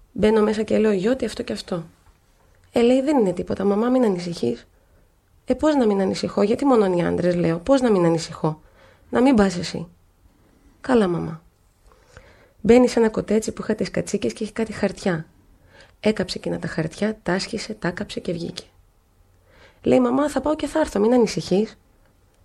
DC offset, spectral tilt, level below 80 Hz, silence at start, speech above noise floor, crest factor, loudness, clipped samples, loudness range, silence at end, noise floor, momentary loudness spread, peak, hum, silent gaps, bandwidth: under 0.1%; -6 dB/octave; -48 dBFS; 0.15 s; 37 dB; 20 dB; -21 LUFS; under 0.1%; 6 LU; 0.7 s; -58 dBFS; 11 LU; -2 dBFS; none; none; 12.5 kHz